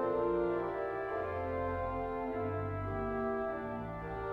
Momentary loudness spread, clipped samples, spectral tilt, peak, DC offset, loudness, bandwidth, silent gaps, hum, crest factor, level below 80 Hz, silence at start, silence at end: 7 LU; under 0.1%; -9.5 dB/octave; -22 dBFS; under 0.1%; -37 LUFS; 5.8 kHz; none; none; 14 dB; -52 dBFS; 0 s; 0 s